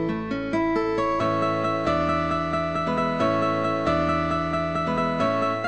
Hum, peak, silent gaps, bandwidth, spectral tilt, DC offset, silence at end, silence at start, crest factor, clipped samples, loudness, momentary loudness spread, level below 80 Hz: none; -12 dBFS; none; 9.2 kHz; -7 dB/octave; 0.5%; 0 s; 0 s; 12 dB; under 0.1%; -24 LUFS; 2 LU; -46 dBFS